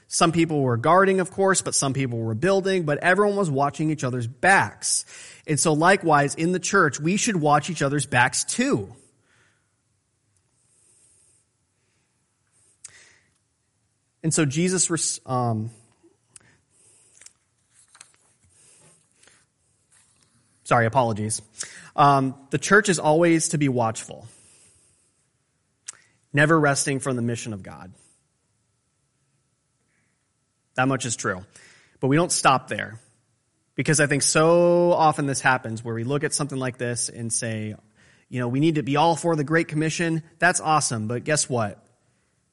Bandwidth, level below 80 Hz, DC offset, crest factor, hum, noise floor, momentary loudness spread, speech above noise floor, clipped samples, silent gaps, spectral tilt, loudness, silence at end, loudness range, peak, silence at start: 11.5 kHz; -62 dBFS; under 0.1%; 20 dB; none; -71 dBFS; 13 LU; 50 dB; under 0.1%; none; -4 dB/octave; -22 LUFS; 0.8 s; 10 LU; -4 dBFS; 0.1 s